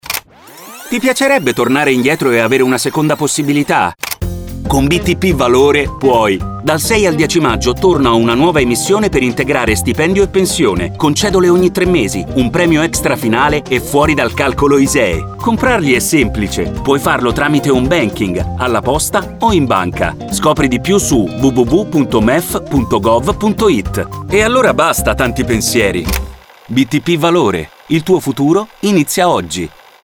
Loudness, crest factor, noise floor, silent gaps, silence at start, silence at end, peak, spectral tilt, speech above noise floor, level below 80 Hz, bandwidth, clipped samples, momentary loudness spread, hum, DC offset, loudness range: -12 LUFS; 12 dB; -36 dBFS; none; 0.05 s; 0.35 s; 0 dBFS; -4.5 dB/octave; 24 dB; -28 dBFS; over 20 kHz; under 0.1%; 6 LU; none; under 0.1%; 2 LU